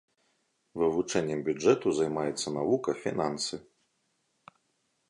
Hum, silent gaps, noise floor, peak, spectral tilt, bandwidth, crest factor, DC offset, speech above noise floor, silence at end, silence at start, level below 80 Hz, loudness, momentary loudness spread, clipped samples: none; none; -76 dBFS; -10 dBFS; -4.5 dB/octave; 11.5 kHz; 20 dB; under 0.1%; 47 dB; 1.5 s; 0.75 s; -66 dBFS; -29 LUFS; 8 LU; under 0.1%